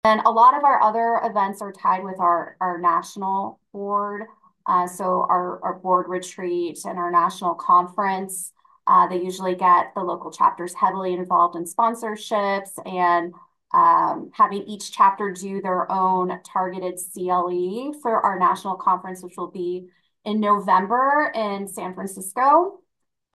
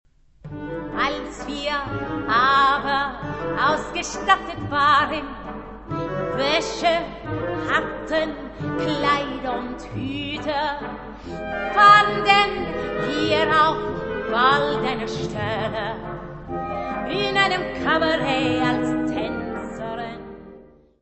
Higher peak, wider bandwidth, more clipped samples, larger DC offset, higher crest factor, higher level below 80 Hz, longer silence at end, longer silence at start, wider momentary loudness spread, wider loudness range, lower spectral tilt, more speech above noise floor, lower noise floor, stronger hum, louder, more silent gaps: about the same, -4 dBFS vs -2 dBFS; first, 12.5 kHz vs 8.4 kHz; neither; neither; about the same, 18 dB vs 22 dB; second, -72 dBFS vs -44 dBFS; first, 0.6 s vs 0.4 s; second, 0.05 s vs 0.45 s; second, 12 LU vs 15 LU; second, 3 LU vs 7 LU; about the same, -4.5 dB/octave vs -4.5 dB/octave; first, 58 dB vs 26 dB; first, -79 dBFS vs -47 dBFS; neither; about the same, -21 LUFS vs -21 LUFS; neither